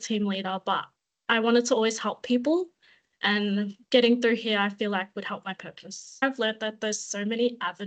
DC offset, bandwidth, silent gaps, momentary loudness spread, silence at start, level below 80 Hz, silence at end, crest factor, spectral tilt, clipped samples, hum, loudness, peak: under 0.1%; 9 kHz; none; 15 LU; 0 s; -76 dBFS; 0 s; 20 dB; -3.5 dB/octave; under 0.1%; none; -26 LUFS; -8 dBFS